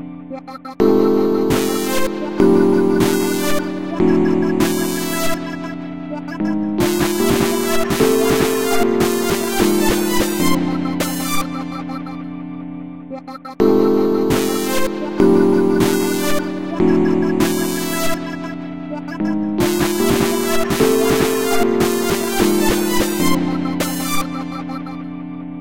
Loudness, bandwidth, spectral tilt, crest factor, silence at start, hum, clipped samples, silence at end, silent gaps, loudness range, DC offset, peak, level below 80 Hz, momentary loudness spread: -17 LUFS; 17 kHz; -5 dB/octave; 16 dB; 0 s; none; under 0.1%; 0 s; none; 3 LU; 3%; 0 dBFS; -38 dBFS; 13 LU